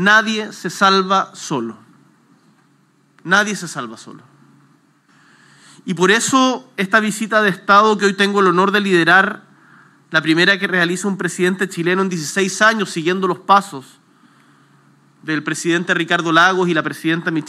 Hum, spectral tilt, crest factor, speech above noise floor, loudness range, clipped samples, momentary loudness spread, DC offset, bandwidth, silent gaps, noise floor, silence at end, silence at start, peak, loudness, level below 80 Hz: none; -4 dB/octave; 18 dB; 40 dB; 9 LU; under 0.1%; 13 LU; under 0.1%; 14.5 kHz; none; -56 dBFS; 0 s; 0 s; 0 dBFS; -15 LUFS; -78 dBFS